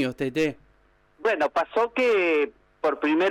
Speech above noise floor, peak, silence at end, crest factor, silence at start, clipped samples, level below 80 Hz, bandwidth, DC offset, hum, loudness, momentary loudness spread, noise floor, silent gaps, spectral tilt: 38 dB; -14 dBFS; 0 s; 10 dB; 0 s; under 0.1%; -62 dBFS; 13 kHz; under 0.1%; none; -24 LUFS; 7 LU; -61 dBFS; none; -5.5 dB/octave